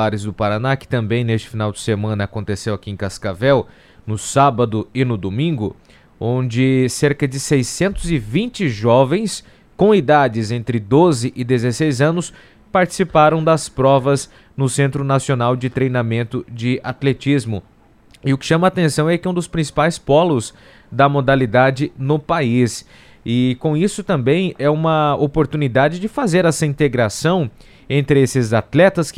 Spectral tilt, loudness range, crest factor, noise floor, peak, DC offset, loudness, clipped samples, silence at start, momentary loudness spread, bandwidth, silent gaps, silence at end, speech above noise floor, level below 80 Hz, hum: -6 dB/octave; 3 LU; 16 dB; -49 dBFS; 0 dBFS; under 0.1%; -17 LUFS; under 0.1%; 0 s; 10 LU; 14.5 kHz; none; 0.05 s; 32 dB; -42 dBFS; none